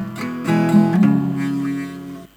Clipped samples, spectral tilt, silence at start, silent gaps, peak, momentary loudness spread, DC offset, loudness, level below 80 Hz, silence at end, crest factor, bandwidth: under 0.1%; -8 dB/octave; 0 s; none; -2 dBFS; 13 LU; under 0.1%; -18 LUFS; -58 dBFS; 0.1 s; 16 dB; 14.5 kHz